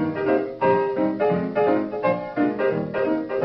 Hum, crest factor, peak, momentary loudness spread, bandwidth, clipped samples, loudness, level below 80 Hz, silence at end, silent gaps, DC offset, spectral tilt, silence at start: none; 14 dB; -8 dBFS; 3 LU; 5.8 kHz; under 0.1%; -22 LUFS; -60 dBFS; 0 s; none; under 0.1%; -10 dB/octave; 0 s